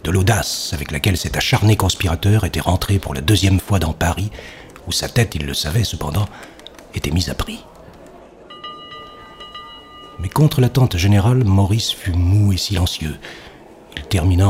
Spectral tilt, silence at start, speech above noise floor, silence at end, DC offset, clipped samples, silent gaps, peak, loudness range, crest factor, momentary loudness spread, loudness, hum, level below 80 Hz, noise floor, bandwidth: -5 dB/octave; 0.05 s; 24 dB; 0 s; under 0.1%; under 0.1%; none; 0 dBFS; 11 LU; 18 dB; 20 LU; -18 LUFS; none; -32 dBFS; -41 dBFS; 16 kHz